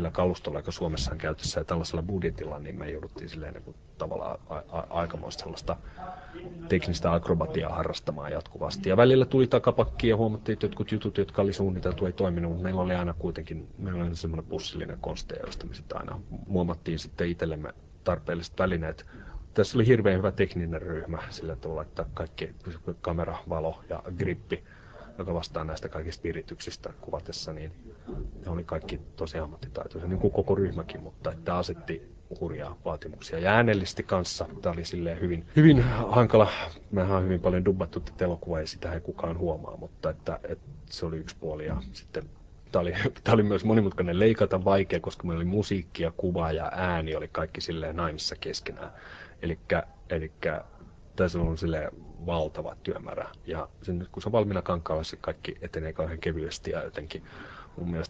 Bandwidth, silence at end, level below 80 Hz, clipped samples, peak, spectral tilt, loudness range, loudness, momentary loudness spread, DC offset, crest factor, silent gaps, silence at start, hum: 8.8 kHz; 0 s; -44 dBFS; under 0.1%; -4 dBFS; -6.5 dB/octave; 11 LU; -29 LUFS; 16 LU; under 0.1%; 24 dB; none; 0 s; none